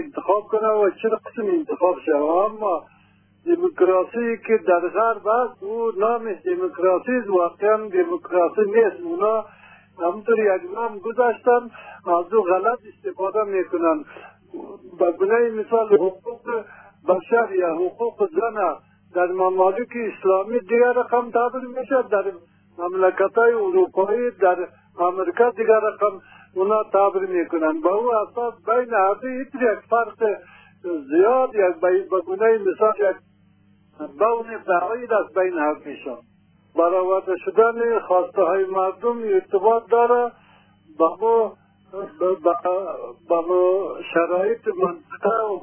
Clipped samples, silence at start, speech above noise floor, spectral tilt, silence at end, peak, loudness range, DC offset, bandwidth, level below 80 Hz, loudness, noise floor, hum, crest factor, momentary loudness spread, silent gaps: under 0.1%; 0 s; 36 dB; -9.5 dB/octave; 0 s; -4 dBFS; 2 LU; under 0.1%; 3.4 kHz; -70 dBFS; -21 LUFS; -56 dBFS; none; 18 dB; 10 LU; none